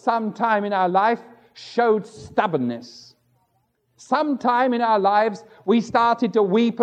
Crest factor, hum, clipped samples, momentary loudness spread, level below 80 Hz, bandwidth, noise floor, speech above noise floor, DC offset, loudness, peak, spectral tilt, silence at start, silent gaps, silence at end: 18 dB; none; under 0.1%; 9 LU; -66 dBFS; 9 kHz; -68 dBFS; 48 dB; under 0.1%; -21 LUFS; -4 dBFS; -6 dB/octave; 0.05 s; none; 0 s